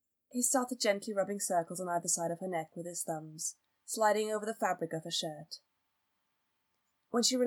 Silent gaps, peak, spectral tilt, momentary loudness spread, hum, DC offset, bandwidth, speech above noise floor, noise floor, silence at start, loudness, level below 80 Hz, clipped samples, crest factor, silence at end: none; -14 dBFS; -2.5 dB/octave; 11 LU; none; under 0.1%; over 20 kHz; 47 dB; -81 dBFS; 0.35 s; -34 LUFS; under -90 dBFS; under 0.1%; 20 dB; 0 s